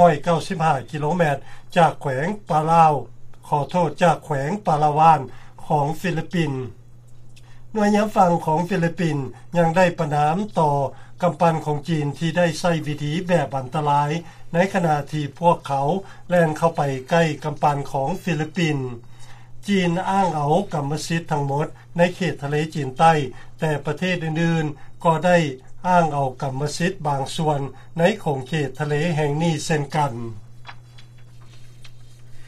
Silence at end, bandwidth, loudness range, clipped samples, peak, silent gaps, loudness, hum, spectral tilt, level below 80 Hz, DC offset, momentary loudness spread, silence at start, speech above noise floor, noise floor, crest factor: 0 s; 13.5 kHz; 3 LU; under 0.1%; -2 dBFS; none; -21 LUFS; none; -6.5 dB/octave; -46 dBFS; under 0.1%; 8 LU; 0 s; 21 dB; -41 dBFS; 20 dB